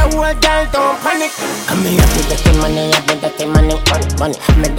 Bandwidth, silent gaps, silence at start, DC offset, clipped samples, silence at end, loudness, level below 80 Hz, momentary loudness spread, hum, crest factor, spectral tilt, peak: 17 kHz; none; 0 s; under 0.1%; under 0.1%; 0 s; -14 LUFS; -18 dBFS; 5 LU; none; 12 dB; -4.5 dB/octave; 0 dBFS